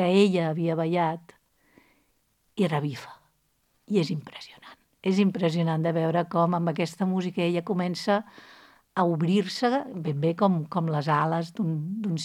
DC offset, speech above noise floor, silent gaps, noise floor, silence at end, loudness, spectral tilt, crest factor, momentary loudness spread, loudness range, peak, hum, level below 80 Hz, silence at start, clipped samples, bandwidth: under 0.1%; 45 dB; none; -70 dBFS; 0 s; -26 LUFS; -7 dB/octave; 18 dB; 10 LU; 6 LU; -8 dBFS; none; -74 dBFS; 0 s; under 0.1%; 12 kHz